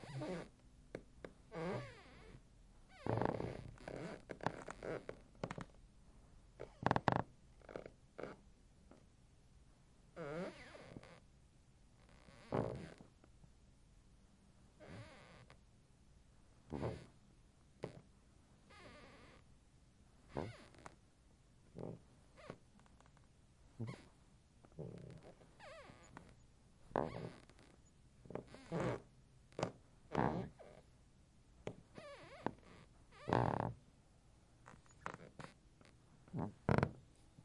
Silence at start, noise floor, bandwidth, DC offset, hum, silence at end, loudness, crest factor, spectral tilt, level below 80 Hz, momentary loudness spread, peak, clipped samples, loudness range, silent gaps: 0 s; -69 dBFS; 11.5 kHz; under 0.1%; none; 0 s; -46 LUFS; 34 dB; -7 dB/octave; -66 dBFS; 26 LU; -14 dBFS; under 0.1%; 12 LU; none